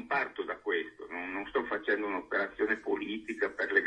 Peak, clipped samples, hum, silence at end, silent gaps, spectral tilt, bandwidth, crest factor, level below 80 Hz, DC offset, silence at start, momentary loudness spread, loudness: -14 dBFS; under 0.1%; none; 0 s; none; -5 dB/octave; 9.4 kHz; 20 dB; -68 dBFS; under 0.1%; 0 s; 6 LU; -33 LUFS